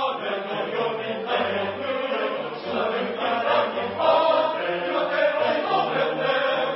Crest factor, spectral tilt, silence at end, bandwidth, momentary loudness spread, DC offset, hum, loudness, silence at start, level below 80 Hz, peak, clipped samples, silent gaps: 16 dB; -8.5 dB/octave; 0 s; 5.8 kHz; 7 LU; under 0.1%; none; -24 LUFS; 0 s; -72 dBFS; -8 dBFS; under 0.1%; none